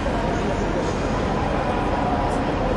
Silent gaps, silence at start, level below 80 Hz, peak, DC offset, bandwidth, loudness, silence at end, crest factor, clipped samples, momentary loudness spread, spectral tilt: none; 0 s; -30 dBFS; -10 dBFS; under 0.1%; 11.5 kHz; -23 LUFS; 0 s; 12 dB; under 0.1%; 1 LU; -6.5 dB/octave